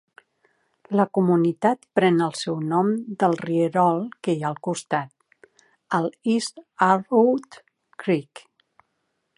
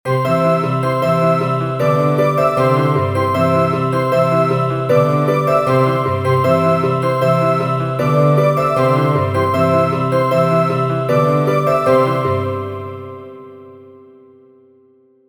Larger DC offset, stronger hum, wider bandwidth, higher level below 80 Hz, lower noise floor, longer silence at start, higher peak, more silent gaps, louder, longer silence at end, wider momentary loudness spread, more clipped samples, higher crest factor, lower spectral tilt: second, under 0.1% vs 0.2%; second, none vs 50 Hz at -45 dBFS; second, 11.5 kHz vs 20 kHz; second, -74 dBFS vs -54 dBFS; first, -75 dBFS vs -51 dBFS; first, 0.9 s vs 0.05 s; about the same, -4 dBFS vs -2 dBFS; neither; second, -23 LUFS vs -15 LUFS; second, 1 s vs 1.35 s; first, 8 LU vs 4 LU; neither; first, 20 dB vs 14 dB; second, -6.5 dB/octave vs -8 dB/octave